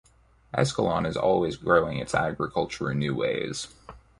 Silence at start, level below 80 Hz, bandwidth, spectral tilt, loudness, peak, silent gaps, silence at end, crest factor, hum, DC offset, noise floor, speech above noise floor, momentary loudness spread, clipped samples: 0.55 s; -52 dBFS; 11.5 kHz; -5.5 dB/octave; -26 LUFS; -6 dBFS; none; 0.2 s; 20 dB; none; under 0.1%; -52 dBFS; 26 dB; 9 LU; under 0.1%